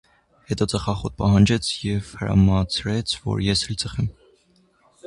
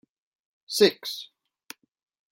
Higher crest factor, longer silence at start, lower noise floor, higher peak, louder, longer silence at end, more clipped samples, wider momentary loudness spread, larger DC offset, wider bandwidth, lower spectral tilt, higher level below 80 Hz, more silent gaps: second, 18 dB vs 24 dB; second, 0.5 s vs 0.7 s; first, -60 dBFS vs -50 dBFS; about the same, -4 dBFS vs -4 dBFS; about the same, -22 LUFS vs -24 LUFS; second, 0.95 s vs 1.1 s; neither; second, 10 LU vs 25 LU; neither; second, 11.5 kHz vs 16.5 kHz; first, -5.5 dB/octave vs -3 dB/octave; first, -38 dBFS vs -76 dBFS; neither